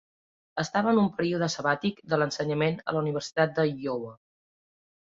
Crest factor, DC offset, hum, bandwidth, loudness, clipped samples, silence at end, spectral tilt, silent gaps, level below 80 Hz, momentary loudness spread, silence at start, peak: 18 dB; under 0.1%; none; 7.8 kHz; -27 LUFS; under 0.1%; 1 s; -5.5 dB/octave; none; -66 dBFS; 9 LU; 0.55 s; -10 dBFS